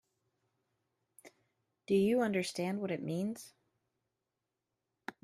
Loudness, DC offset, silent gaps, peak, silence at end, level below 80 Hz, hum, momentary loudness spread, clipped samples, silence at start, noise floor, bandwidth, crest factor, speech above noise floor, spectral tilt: -34 LUFS; under 0.1%; none; -20 dBFS; 0.15 s; -76 dBFS; none; 20 LU; under 0.1%; 1.25 s; -88 dBFS; 14 kHz; 18 dB; 55 dB; -6 dB/octave